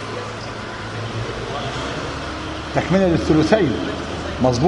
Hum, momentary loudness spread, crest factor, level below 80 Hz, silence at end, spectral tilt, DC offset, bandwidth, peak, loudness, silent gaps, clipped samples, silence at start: none; 12 LU; 20 dB; -38 dBFS; 0 s; -6 dB/octave; under 0.1%; 11 kHz; 0 dBFS; -21 LUFS; none; under 0.1%; 0 s